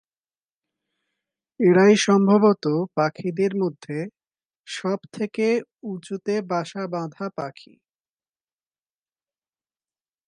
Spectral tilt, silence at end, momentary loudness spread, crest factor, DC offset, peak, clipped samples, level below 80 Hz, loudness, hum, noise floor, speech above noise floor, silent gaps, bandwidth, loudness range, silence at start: -6 dB/octave; 2.75 s; 16 LU; 20 dB; under 0.1%; -4 dBFS; under 0.1%; -76 dBFS; -22 LUFS; none; under -90 dBFS; over 68 dB; 4.45-4.50 s, 4.56-4.64 s; 10.5 kHz; 13 LU; 1.6 s